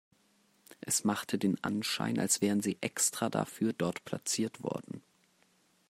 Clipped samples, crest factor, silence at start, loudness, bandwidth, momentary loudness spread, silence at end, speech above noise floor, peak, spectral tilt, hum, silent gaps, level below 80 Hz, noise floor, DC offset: under 0.1%; 20 dB; 0.85 s; -32 LUFS; 16 kHz; 10 LU; 0.9 s; 37 dB; -14 dBFS; -3.5 dB/octave; none; none; -76 dBFS; -70 dBFS; under 0.1%